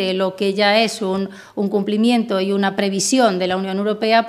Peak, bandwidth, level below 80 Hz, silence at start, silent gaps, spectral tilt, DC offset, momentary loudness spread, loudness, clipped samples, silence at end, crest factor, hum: 0 dBFS; 14.5 kHz; -66 dBFS; 0 s; none; -4 dB/octave; under 0.1%; 7 LU; -18 LUFS; under 0.1%; 0 s; 16 dB; none